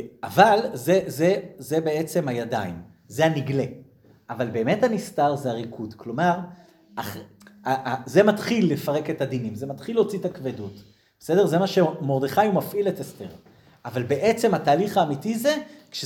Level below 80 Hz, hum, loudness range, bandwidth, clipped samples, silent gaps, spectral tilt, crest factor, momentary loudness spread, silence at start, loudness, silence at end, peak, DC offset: -64 dBFS; none; 3 LU; 20 kHz; under 0.1%; none; -6 dB/octave; 22 dB; 15 LU; 0 s; -23 LUFS; 0 s; -2 dBFS; under 0.1%